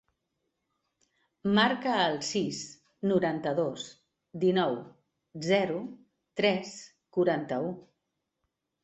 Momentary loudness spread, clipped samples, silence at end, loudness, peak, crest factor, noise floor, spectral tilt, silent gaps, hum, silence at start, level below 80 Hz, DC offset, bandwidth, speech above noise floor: 17 LU; under 0.1%; 1.05 s; -29 LUFS; -10 dBFS; 20 dB; -83 dBFS; -5 dB/octave; none; none; 1.45 s; -72 dBFS; under 0.1%; 8.2 kHz; 54 dB